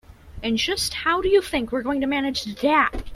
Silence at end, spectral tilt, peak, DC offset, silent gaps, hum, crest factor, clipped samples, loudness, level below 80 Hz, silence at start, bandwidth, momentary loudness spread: 0 s; -3.5 dB/octave; -6 dBFS; under 0.1%; none; none; 16 dB; under 0.1%; -22 LUFS; -40 dBFS; 0.25 s; 15.5 kHz; 6 LU